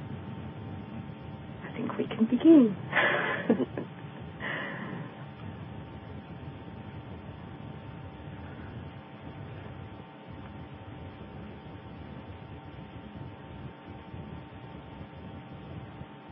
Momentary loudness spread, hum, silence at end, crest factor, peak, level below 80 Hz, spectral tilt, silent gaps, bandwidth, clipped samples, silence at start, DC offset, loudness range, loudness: 19 LU; none; 0 s; 24 dB; -10 dBFS; -54 dBFS; -5.5 dB/octave; none; 3.8 kHz; under 0.1%; 0 s; under 0.1%; 18 LU; -30 LUFS